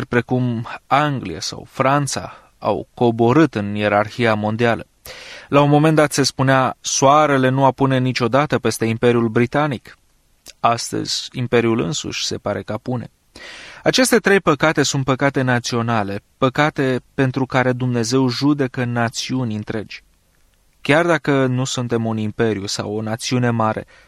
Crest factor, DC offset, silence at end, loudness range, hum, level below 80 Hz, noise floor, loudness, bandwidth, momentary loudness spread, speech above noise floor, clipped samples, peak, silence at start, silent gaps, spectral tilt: 16 dB; under 0.1%; 0.25 s; 5 LU; none; -52 dBFS; -57 dBFS; -18 LUFS; 15 kHz; 11 LU; 39 dB; under 0.1%; -2 dBFS; 0 s; none; -5 dB/octave